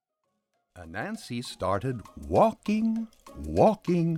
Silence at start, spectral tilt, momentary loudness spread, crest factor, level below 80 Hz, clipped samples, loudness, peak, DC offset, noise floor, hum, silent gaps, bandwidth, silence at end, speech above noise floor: 0.75 s; -7 dB/octave; 15 LU; 20 dB; -50 dBFS; under 0.1%; -27 LUFS; -8 dBFS; under 0.1%; -80 dBFS; none; none; 14.5 kHz; 0 s; 53 dB